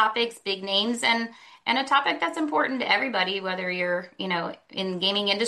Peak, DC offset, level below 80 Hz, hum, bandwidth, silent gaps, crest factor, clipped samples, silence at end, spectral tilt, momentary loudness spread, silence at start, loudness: -6 dBFS; under 0.1%; -76 dBFS; none; 12.5 kHz; none; 20 dB; under 0.1%; 0 s; -3.5 dB/octave; 8 LU; 0 s; -25 LUFS